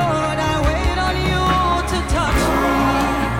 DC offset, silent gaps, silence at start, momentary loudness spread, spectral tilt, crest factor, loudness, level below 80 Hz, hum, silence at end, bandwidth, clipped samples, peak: under 0.1%; none; 0 s; 2 LU; -5 dB/octave; 10 dB; -18 LUFS; -26 dBFS; none; 0 s; 17 kHz; under 0.1%; -8 dBFS